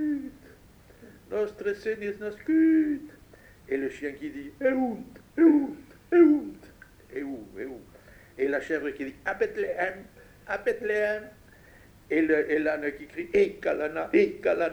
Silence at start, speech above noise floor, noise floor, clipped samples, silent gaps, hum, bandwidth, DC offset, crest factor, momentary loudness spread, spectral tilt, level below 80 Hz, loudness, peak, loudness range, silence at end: 0 s; 28 dB; -54 dBFS; under 0.1%; none; none; 9 kHz; under 0.1%; 20 dB; 17 LU; -6.5 dB/octave; -60 dBFS; -27 LUFS; -8 dBFS; 6 LU; 0 s